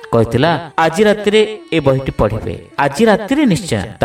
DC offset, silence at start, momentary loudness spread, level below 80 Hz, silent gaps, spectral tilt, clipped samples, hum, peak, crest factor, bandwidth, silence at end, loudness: under 0.1%; 0 s; 6 LU; -36 dBFS; none; -6 dB/octave; under 0.1%; none; 0 dBFS; 14 dB; 15 kHz; 0 s; -14 LUFS